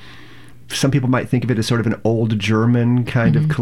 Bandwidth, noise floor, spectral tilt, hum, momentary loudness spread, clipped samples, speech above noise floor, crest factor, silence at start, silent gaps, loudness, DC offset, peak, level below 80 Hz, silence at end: 14 kHz; -43 dBFS; -6.5 dB/octave; none; 3 LU; under 0.1%; 26 dB; 12 dB; 0 s; none; -17 LUFS; 0.9%; -4 dBFS; -46 dBFS; 0 s